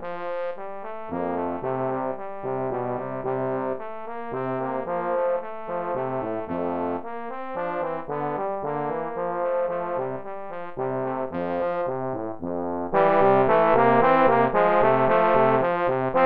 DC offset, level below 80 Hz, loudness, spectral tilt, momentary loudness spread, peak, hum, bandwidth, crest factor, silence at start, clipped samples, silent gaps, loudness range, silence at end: 0.6%; -54 dBFS; -24 LUFS; -10 dB/octave; 14 LU; -6 dBFS; none; 5 kHz; 18 dB; 0 s; under 0.1%; none; 10 LU; 0 s